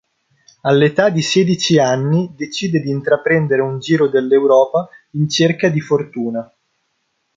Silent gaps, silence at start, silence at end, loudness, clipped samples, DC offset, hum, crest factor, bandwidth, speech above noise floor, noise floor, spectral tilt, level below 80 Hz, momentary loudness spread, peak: none; 0.65 s; 0.9 s; -15 LUFS; under 0.1%; under 0.1%; none; 14 dB; 7.8 kHz; 53 dB; -68 dBFS; -5.5 dB/octave; -58 dBFS; 10 LU; -2 dBFS